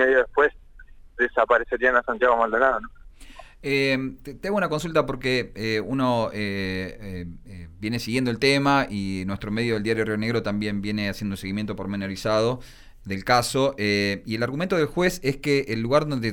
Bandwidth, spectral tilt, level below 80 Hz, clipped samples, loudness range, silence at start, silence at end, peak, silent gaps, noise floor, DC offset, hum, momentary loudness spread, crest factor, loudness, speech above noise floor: 19 kHz; -5.5 dB/octave; -46 dBFS; under 0.1%; 4 LU; 0 s; 0 s; -6 dBFS; none; -46 dBFS; under 0.1%; none; 13 LU; 18 dB; -24 LUFS; 22 dB